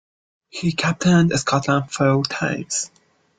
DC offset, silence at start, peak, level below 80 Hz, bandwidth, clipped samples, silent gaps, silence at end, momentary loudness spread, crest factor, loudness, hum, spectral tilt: under 0.1%; 0.55 s; -4 dBFS; -54 dBFS; 9.4 kHz; under 0.1%; none; 0.5 s; 9 LU; 18 dB; -20 LUFS; none; -5 dB/octave